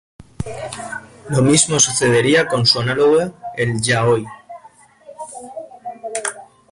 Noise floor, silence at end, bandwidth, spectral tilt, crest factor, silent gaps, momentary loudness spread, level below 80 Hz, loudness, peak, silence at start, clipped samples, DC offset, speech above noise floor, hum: -47 dBFS; 0.25 s; 11.5 kHz; -3.5 dB/octave; 18 dB; none; 20 LU; -48 dBFS; -16 LUFS; -2 dBFS; 0.2 s; under 0.1%; under 0.1%; 31 dB; none